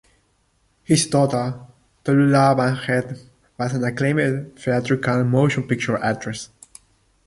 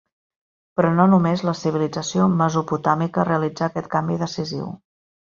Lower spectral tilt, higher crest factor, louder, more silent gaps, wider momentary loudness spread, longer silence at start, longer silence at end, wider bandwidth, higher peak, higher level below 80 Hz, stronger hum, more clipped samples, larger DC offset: about the same, -6 dB/octave vs -6.5 dB/octave; about the same, 18 dB vs 18 dB; about the same, -20 LUFS vs -21 LUFS; neither; about the same, 14 LU vs 12 LU; first, 0.9 s vs 0.75 s; first, 0.8 s vs 0.5 s; first, 11.5 kHz vs 7.4 kHz; about the same, -4 dBFS vs -2 dBFS; about the same, -56 dBFS vs -58 dBFS; neither; neither; neither